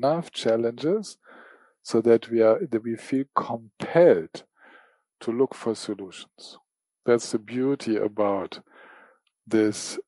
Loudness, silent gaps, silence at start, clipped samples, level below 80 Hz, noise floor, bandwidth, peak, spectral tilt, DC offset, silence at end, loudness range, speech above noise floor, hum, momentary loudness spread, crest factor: -25 LUFS; none; 0 s; under 0.1%; -74 dBFS; -58 dBFS; 11.5 kHz; -6 dBFS; -5.5 dB/octave; under 0.1%; 0.05 s; 5 LU; 34 dB; none; 21 LU; 20 dB